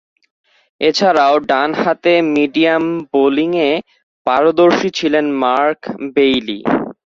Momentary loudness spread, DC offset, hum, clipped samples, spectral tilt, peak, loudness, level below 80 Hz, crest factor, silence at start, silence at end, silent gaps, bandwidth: 6 LU; under 0.1%; none; under 0.1%; -5 dB/octave; -2 dBFS; -14 LUFS; -56 dBFS; 14 dB; 0.8 s; 0.2 s; 4.03-4.25 s; 7.4 kHz